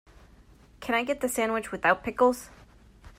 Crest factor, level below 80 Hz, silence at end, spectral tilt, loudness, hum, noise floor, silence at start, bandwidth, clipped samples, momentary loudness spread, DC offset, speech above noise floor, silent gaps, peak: 20 dB; -56 dBFS; 0.1 s; -3.5 dB/octave; -27 LUFS; none; -55 dBFS; 0.8 s; 16 kHz; under 0.1%; 13 LU; under 0.1%; 29 dB; none; -10 dBFS